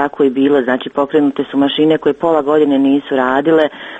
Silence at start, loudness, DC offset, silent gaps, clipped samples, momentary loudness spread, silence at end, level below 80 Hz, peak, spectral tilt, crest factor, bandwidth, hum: 0 s; -13 LUFS; under 0.1%; none; under 0.1%; 4 LU; 0 s; -54 dBFS; 0 dBFS; -7 dB/octave; 14 dB; 7.6 kHz; none